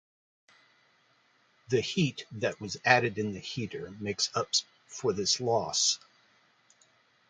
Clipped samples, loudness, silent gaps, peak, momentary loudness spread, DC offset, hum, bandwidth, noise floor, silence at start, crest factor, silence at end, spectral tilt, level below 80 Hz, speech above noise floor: under 0.1%; -29 LUFS; none; -6 dBFS; 12 LU; under 0.1%; none; 10 kHz; -67 dBFS; 1.7 s; 28 dB; 1.35 s; -3 dB/octave; -66 dBFS; 37 dB